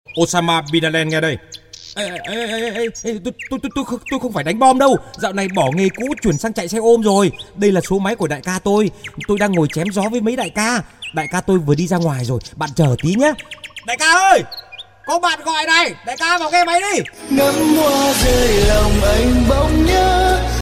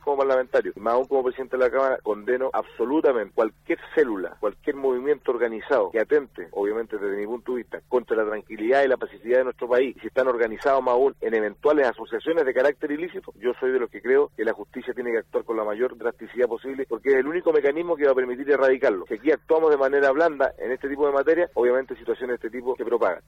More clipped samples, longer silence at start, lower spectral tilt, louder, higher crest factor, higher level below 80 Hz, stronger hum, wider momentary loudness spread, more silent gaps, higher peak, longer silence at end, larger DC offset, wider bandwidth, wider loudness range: neither; about the same, 0.1 s vs 0.05 s; second, -4.5 dB/octave vs -6 dB/octave; first, -16 LUFS vs -24 LUFS; about the same, 16 dB vs 14 dB; first, -28 dBFS vs -60 dBFS; neither; about the same, 11 LU vs 9 LU; neither; first, 0 dBFS vs -10 dBFS; about the same, 0 s vs 0.1 s; neither; first, 16.5 kHz vs 7.6 kHz; about the same, 5 LU vs 4 LU